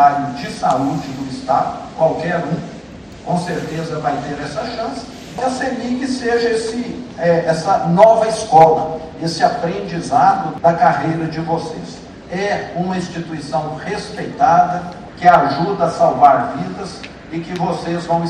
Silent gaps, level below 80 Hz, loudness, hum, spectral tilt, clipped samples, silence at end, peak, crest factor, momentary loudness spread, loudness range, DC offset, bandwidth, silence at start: none; -46 dBFS; -17 LUFS; none; -6 dB/octave; 0.1%; 0 s; 0 dBFS; 16 dB; 15 LU; 8 LU; under 0.1%; 10.5 kHz; 0 s